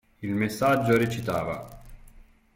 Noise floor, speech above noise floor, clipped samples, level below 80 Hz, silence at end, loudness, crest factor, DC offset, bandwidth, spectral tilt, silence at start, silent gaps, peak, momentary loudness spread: -52 dBFS; 27 dB; under 0.1%; -52 dBFS; 0.35 s; -26 LUFS; 18 dB; under 0.1%; 16.5 kHz; -6.5 dB/octave; 0.2 s; none; -10 dBFS; 13 LU